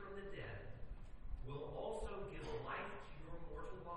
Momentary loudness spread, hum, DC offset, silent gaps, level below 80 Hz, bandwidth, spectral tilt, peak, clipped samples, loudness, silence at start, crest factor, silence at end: 9 LU; none; under 0.1%; none; -54 dBFS; 10 kHz; -6 dB/octave; -34 dBFS; under 0.1%; -50 LUFS; 0 s; 14 dB; 0 s